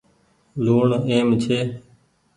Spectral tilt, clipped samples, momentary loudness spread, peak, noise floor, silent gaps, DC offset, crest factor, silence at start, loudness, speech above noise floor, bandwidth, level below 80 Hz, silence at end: -7 dB/octave; under 0.1%; 14 LU; -6 dBFS; -60 dBFS; none; under 0.1%; 16 dB; 0.55 s; -20 LUFS; 41 dB; 10.5 kHz; -56 dBFS; 0.55 s